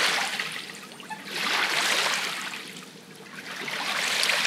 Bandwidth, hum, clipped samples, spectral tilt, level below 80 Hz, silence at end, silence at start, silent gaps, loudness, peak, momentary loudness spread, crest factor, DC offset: 16 kHz; none; under 0.1%; 0 dB/octave; -84 dBFS; 0 s; 0 s; none; -26 LUFS; -4 dBFS; 18 LU; 24 dB; under 0.1%